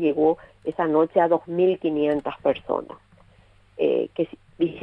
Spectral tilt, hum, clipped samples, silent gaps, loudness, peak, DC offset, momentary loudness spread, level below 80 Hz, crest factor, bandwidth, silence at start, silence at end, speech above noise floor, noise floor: -9 dB/octave; none; under 0.1%; none; -24 LUFS; -6 dBFS; under 0.1%; 9 LU; -60 dBFS; 18 dB; 4.3 kHz; 0 s; 0 s; 32 dB; -55 dBFS